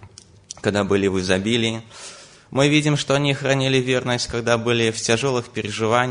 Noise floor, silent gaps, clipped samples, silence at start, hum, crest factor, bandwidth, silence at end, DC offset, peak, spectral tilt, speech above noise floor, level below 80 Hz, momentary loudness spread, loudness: -46 dBFS; none; under 0.1%; 0 s; none; 18 dB; 10 kHz; 0 s; under 0.1%; -2 dBFS; -4.5 dB/octave; 26 dB; -52 dBFS; 9 LU; -20 LUFS